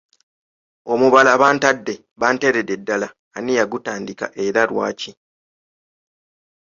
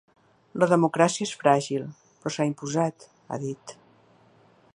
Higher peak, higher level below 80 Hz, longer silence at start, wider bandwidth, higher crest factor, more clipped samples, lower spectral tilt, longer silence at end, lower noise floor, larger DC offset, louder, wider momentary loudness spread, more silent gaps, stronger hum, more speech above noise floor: first, 0 dBFS vs -4 dBFS; first, -62 dBFS vs -74 dBFS; first, 0.85 s vs 0.55 s; second, 7.6 kHz vs 11.5 kHz; about the same, 20 dB vs 22 dB; neither; second, -4 dB/octave vs -5.5 dB/octave; first, 1.65 s vs 1.05 s; first, under -90 dBFS vs -58 dBFS; neither; first, -18 LUFS vs -25 LUFS; about the same, 17 LU vs 17 LU; first, 2.11-2.16 s, 3.19-3.31 s vs none; neither; first, over 72 dB vs 34 dB